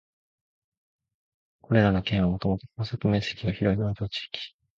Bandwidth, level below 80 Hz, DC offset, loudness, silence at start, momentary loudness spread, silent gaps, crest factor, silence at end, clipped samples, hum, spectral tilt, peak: 7.2 kHz; -46 dBFS; under 0.1%; -27 LUFS; 1.7 s; 11 LU; none; 20 dB; 0.3 s; under 0.1%; none; -7.5 dB/octave; -8 dBFS